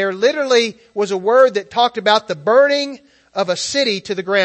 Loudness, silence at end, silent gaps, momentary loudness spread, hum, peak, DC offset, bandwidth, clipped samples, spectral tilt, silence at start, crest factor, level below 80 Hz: -16 LUFS; 0 s; none; 9 LU; none; 0 dBFS; under 0.1%; 8.6 kHz; under 0.1%; -3 dB/octave; 0 s; 16 dB; -64 dBFS